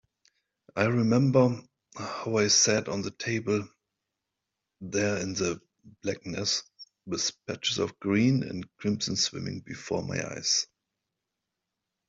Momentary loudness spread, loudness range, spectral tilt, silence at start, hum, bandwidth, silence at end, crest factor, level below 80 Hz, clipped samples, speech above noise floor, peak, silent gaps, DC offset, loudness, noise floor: 16 LU; 7 LU; -4 dB/octave; 0.75 s; none; 8.2 kHz; 1.45 s; 22 dB; -66 dBFS; under 0.1%; 58 dB; -8 dBFS; none; under 0.1%; -28 LUFS; -86 dBFS